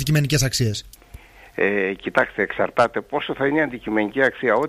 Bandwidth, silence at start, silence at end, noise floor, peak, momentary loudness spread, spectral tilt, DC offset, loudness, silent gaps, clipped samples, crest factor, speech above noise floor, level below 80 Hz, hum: 15.5 kHz; 0 s; 0 s; -44 dBFS; -4 dBFS; 6 LU; -5 dB/octave; under 0.1%; -21 LUFS; none; under 0.1%; 18 dB; 23 dB; -44 dBFS; none